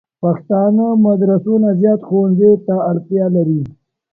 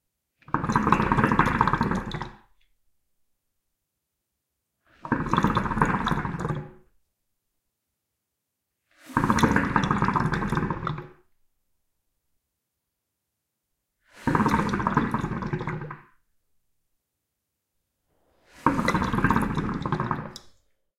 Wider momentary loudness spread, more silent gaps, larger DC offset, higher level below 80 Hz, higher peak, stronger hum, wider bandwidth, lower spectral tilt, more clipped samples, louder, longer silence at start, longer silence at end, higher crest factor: second, 7 LU vs 13 LU; neither; neither; second, -56 dBFS vs -42 dBFS; about the same, 0 dBFS vs -2 dBFS; neither; second, 2.1 kHz vs 15.5 kHz; first, -14.5 dB/octave vs -6.5 dB/octave; neither; first, -14 LUFS vs -25 LUFS; second, 0.2 s vs 0.5 s; about the same, 0.45 s vs 0.5 s; second, 14 dB vs 26 dB